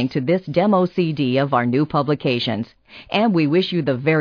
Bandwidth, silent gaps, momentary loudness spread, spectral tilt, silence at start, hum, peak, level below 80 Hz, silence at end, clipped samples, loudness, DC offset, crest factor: 5.4 kHz; none; 5 LU; -8.5 dB/octave; 0 s; none; -4 dBFS; -56 dBFS; 0 s; under 0.1%; -19 LUFS; under 0.1%; 14 dB